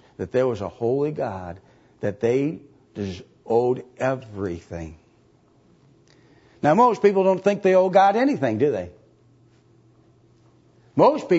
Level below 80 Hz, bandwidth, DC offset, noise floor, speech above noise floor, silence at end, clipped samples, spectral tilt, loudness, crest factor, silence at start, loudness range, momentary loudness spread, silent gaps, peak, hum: -58 dBFS; 8 kHz; under 0.1%; -58 dBFS; 37 dB; 0 s; under 0.1%; -7 dB/octave; -22 LUFS; 18 dB; 0.2 s; 9 LU; 19 LU; none; -4 dBFS; none